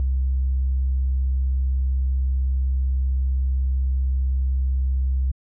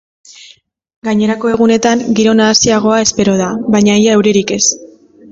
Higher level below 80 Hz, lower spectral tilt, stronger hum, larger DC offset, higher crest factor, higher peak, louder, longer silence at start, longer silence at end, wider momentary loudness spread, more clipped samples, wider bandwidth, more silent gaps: first, -22 dBFS vs -46 dBFS; first, -19.5 dB/octave vs -4 dB/octave; neither; neither; second, 4 dB vs 12 dB; second, -18 dBFS vs 0 dBFS; second, -24 LUFS vs -11 LUFS; second, 0 s vs 1.05 s; second, 0.2 s vs 0.45 s; second, 0 LU vs 6 LU; neither; second, 0.3 kHz vs 7.8 kHz; neither